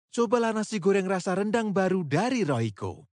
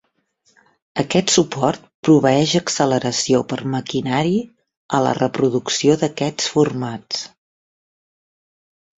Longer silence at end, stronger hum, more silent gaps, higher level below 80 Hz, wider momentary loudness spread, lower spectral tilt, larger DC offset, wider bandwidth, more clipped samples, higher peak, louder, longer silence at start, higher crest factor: second, 0.1 s vs 1.7 s; neither; second, none vs 1.94-2.03 s, 4.77-4.89 s; second, -72 dBFS vs -56 dBFS; second, 4 LU vs 10 LU; first, -6 dB/octave vs -4.5 dB/octave; neither; first, 10 kHz vs 8.4 kHz; neither; second, -10 dBFS vs -2 dBFS; second, -26 LUFS vs -19 LUFS; second, 0.15 s vs 0.95 s; about the same, 16 dB vs 18 dB